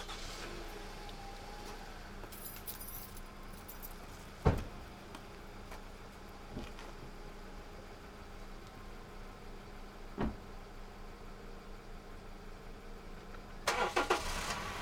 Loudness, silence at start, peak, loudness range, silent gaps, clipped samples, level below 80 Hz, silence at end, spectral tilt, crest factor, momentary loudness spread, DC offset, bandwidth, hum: -43 LUFS; 0 s; -14 dBFS; 11 LU; none; under 0.1%; -48 dBFS; 0 s; -4 dB/octave; 30 dB; 17 LU; under 0.1%; over 20 kHz; none